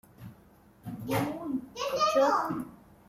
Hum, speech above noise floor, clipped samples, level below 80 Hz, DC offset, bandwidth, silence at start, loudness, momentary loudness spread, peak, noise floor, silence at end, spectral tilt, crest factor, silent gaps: none; 31 dB; under 0.1%; -64 dBFS; under 0.1%; 16 kHz; 0.2 s; -29 LUFS; 24 LU; -14 dBFS; -58 dBFS; 0.35 s; -5 dB/octave; 18 dB; none